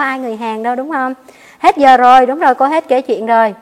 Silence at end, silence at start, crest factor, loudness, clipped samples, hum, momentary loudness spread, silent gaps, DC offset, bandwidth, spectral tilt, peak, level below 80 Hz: 0.05 s; 0 s; 12 dB; -12 LUFS; 0.7%; none; 13 LU; none; under 0.1%; 12.5 kHz; -4 dB/octave; 0 dBFS; -54 dBFS